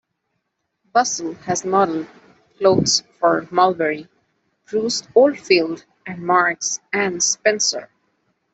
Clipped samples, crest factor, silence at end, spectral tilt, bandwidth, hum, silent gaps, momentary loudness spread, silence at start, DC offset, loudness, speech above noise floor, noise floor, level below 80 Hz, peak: under 0.1%; 18 dB; 0.7 s; -2.5 dB/octave; 8.4 kHz; none; none; 12 LU; 0.95 s; under 0.1%; -19 LUFS; 55 dB; -74 dBFS; -60 dBFS; -2 dBFS